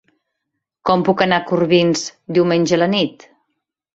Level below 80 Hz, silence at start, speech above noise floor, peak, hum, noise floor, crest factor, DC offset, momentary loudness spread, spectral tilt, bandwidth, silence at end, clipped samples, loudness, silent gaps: -58 dBFS; 0.85 s; 62 dB; 0 dBFS; none; -77 dBFS; 18 dB; under 0.1%; 7 LU; -5 dB/octave; 8 kHz; 0.8 s; under 0.1%; -17 LUFS; none